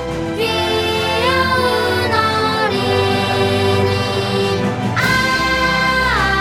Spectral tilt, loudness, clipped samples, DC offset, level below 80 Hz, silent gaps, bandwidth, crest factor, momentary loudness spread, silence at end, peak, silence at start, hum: -4.5 dB/octave; -15 LUFS; under 0.1%; under 0.1%; -36 dBFS; none; 16.5 kHz; 14 dB; 3 LU; 0 s; -2 dBFS; 0 s; none